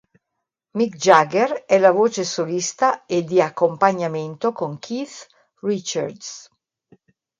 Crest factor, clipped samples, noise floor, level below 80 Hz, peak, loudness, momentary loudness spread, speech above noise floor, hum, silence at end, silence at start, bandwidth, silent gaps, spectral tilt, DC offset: 20 dB; under 0.1%; -80 dBFS; -70 dBFS; 0 dBFS; -20 LUFS; 15 LU; 61 dB; none; 1 s; 0.75 s; 9.4 kHz; none; -4.5 dB/octave; under 0.1%